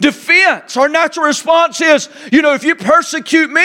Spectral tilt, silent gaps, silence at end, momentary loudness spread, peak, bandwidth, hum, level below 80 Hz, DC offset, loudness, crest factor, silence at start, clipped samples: -2.5 dB/octave; none; 0 s; 5 LU; 0 dBFS; 16 kHz; none; -58 dBFS; under 0.1%; -11 LUFS; 12 dB; 0 s; under 0.1%